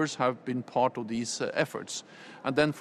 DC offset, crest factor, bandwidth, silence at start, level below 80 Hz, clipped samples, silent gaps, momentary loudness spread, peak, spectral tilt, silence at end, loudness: under 0.1%; 20 dB; 13.5 kHz; 0 s; -66 dBFS; under 0.1%; none; 10 LU; -10 dBFS; -4.5 dB/octave; 0 s; -31 LUFS